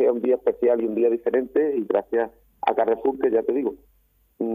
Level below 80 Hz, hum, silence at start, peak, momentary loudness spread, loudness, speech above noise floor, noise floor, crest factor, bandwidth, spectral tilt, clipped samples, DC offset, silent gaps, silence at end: -60 dBFS; none; 0 s; -6 dBFS; 6 LU; -23 LUFS; 21 dB; -43 dBFS; 16 dB; 3.8 kHz; -8.5 dB/octave; under 0.1%; under 0.1%; none; 0 s